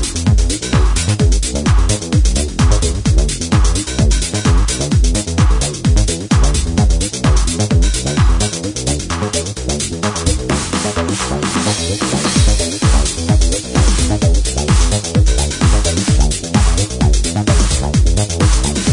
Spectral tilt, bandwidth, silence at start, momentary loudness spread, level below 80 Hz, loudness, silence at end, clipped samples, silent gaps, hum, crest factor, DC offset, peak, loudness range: -4.5 dB/octave; 11 kHz; 0 s; 3 LU; -16 dBFS; -15 LUFS; 0 s; under 0.1%; none; none; 12 dB; under 0.1%; 0 dBFS; 2 LU